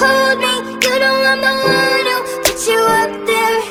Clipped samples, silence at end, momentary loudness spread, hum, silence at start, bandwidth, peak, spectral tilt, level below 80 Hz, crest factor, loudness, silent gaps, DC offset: under 0.1%; 0 s; 4 LU; none; 0 s; 19.5 kHz; 0 dBFS; -2 dB/octave; -46 dBFS; 14 dB; -13 LUFS; none; under 0.1%